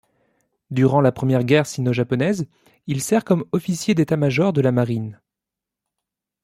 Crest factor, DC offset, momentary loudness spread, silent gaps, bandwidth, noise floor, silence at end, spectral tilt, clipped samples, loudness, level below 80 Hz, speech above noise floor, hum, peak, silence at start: 18 dB; under 0.1%; 11 LU; none; 15 kHz; -86 dBFS; 1.3 s; -6.5 dB/octave; under 0.1%; -20 LUFS; -58 dBFS; 67 dB; none; -4 dBFS; 0.7 s